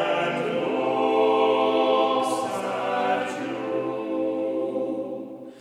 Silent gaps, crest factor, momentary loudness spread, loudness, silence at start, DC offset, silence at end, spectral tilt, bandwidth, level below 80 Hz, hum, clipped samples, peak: none; 14 dB; 9 LU; -24 LUFS; 0 s; under 0.1%; 0 s; -5 dB/octave; 13.5 kHz; -74 dBFS; none; under 0.1%; -10 dBFS